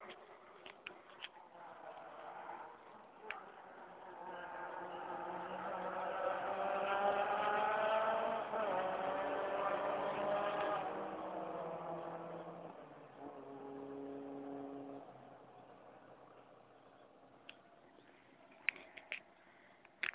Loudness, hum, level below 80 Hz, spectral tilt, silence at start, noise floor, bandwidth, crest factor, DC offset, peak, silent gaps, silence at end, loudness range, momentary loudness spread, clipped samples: -42 LUFS; none; -80 dBFS; -2 dB/octave; 0 s; -65 dBFS; 4 kHz; 28 dB; under 0.1%; -14 dBFS; none; 0 s; 16 LU; 22 LU; under 0.1%